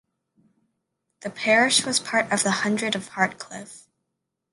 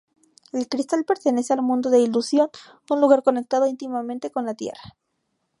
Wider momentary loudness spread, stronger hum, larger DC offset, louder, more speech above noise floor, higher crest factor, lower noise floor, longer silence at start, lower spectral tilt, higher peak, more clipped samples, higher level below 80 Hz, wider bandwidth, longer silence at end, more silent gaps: first, 19 LU vs 12 LU; neither; neither; about the same, -22 LUFS vs -22 LUFS; first, 57 dB vs 53 dB; about the same, 22 dB vs 20 dB; first, -81 dBFS vs -74 dBFS; first, 1.2 s vs 0.55 s; second, -2.5 dB/octave vs -4.5 dB/octave; about the same, -4 dBFS vs -2 dBFS; neither; about the same, -70 dBFS vs -70 dBFS; about the same, 11.5 kHz vs 11.5 kHz; about the same, 0.7 s vs 0.7 s; neither